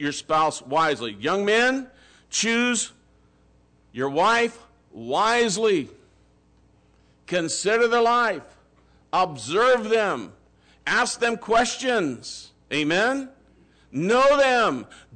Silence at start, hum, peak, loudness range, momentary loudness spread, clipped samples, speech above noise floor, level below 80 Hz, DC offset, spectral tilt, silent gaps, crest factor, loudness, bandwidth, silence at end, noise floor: 0 s; none; -12 dBFS; 3 LU; 14 LU; under 0.1%; 37 dB; -58 dBFS; under 0.1%; -3 dB/octave; none; 12 dB; -22 LUFS; 9.4 kHz; 0.2 s; -59 dBFS